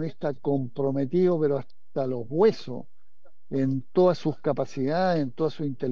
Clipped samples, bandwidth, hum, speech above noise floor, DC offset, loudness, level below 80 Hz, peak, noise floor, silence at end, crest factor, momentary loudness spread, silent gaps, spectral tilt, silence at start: under 0.1%; 7 kHz; none; 40 dB; 2%; -26 LUFS; -72 dBFS; -10 dBFS; -65 dBFS; 0 s; 16 dB; 9 LU; none; -8.5 dB/octave; 0 s